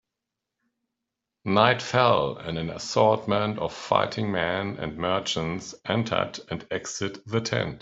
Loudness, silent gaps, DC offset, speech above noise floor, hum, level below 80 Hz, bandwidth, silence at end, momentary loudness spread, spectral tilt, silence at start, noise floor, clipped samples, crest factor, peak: -26 LUFS; none; under 0.1%; 60 dB; none; -58 dBFS; 8 kHz; 0 s; 11 LU; -5 dB/octave; 1.45 s; -86 dBFS; under 0.1%; 24 dB; -2 dBFS